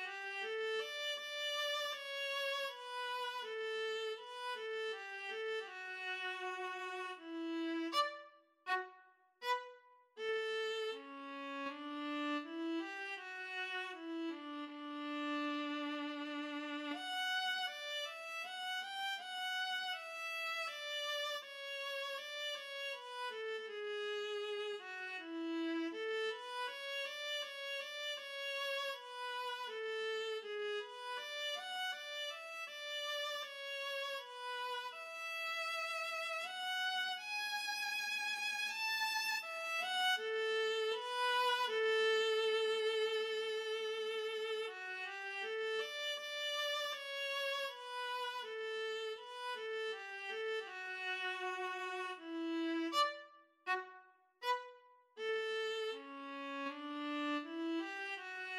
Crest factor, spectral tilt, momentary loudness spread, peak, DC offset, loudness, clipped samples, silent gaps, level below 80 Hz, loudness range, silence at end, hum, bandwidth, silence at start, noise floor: 20 dB; 0.5 dB/octave; 8 LU; -22 dBFS; under 0.1%; -40 LUFS; under 0.1%; none; under -90 dBFS; 6 LU; 0 s; none; 16 kHz; 0 s; -66 dBFS